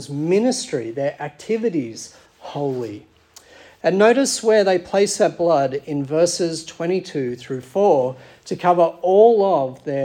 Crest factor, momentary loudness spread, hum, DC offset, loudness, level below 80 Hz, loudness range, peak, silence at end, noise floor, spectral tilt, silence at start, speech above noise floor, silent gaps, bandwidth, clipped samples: 18 dB; 15 LU; none; under 0.1%; -19 LUFS; -64 dBFS; 6 LU; -2 dBFS; 0 s; -48 dBFS; -4.5 dB/octave; 0 s; 29 dB; none; 16 kHz; under 0.1%